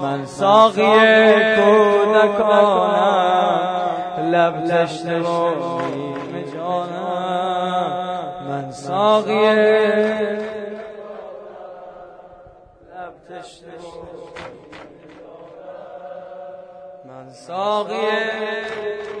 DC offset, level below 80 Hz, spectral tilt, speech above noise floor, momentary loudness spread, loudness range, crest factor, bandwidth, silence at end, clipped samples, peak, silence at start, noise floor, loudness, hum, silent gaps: under 0.1%; -62 dBFS; -5.5 dB/octave; 30 dB; 24 LU; 23 LU; 18 dB; 10 kHz; 0 s; under 0.1%; 0 dBFS; 0 s; -45 dBFS; -17 LUFS; none; none